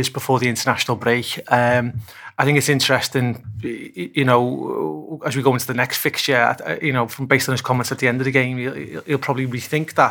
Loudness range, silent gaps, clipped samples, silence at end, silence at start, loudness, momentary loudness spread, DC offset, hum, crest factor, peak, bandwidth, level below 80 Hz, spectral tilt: 2 LU; none; under 0.1%; 0 s; 0 s; -19 LUFS; 11 LU; under 0.1%; none; 20 dB; 0 dBFS; 19 kHz; -58 dBFS; -4.5 dB/octave